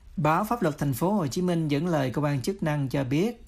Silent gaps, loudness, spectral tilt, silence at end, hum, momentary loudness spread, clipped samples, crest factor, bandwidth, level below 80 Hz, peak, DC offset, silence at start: none; -26 LUFS; -6.5 dB/octave; 0 s; none; 3 LU; under 0.1%; 16 dB; 15.5 kHz; -52 dBFS; -10 dBFS; under 0.1%; 0.05 s